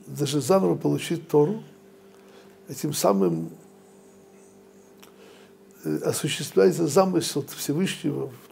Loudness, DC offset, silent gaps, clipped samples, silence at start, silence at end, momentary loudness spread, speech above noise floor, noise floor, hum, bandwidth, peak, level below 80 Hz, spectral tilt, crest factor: -24 LUFS; under 0.1%; none; under 0.1%; 0.05 s; 0.15 s; 12 LU; 28 dB; -52 dBFS; none; 16 kHz; -6 dBFS; -72 dBFS; -5 dB/octave; 20 dB